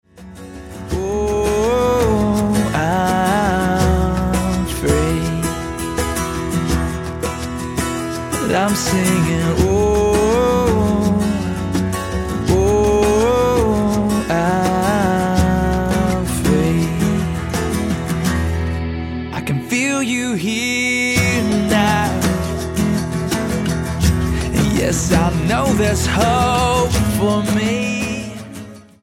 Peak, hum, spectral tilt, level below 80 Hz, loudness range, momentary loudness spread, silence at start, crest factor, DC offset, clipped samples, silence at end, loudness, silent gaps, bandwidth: -2 dBFS; none; -5.5 dB/octave; -28 dBFS; 4 LU; 8 LU; 0.15 s; 16 dB; under 0.1%; under 0.1%; 0.2 s; -17 LUFS; none; 17 kHz